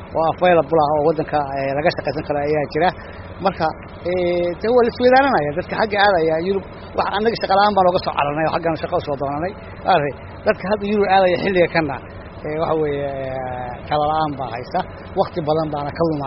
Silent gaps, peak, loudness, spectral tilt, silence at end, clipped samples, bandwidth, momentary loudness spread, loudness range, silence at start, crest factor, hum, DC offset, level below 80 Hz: none; -2 dBFS; -19 LUFS; -4 dB/octave; 0 s; under 0.1%; 5.8 kHz; 11 LU; 5 LU; 0 s; 16 dB; none; under 0.1%; -44 dBFS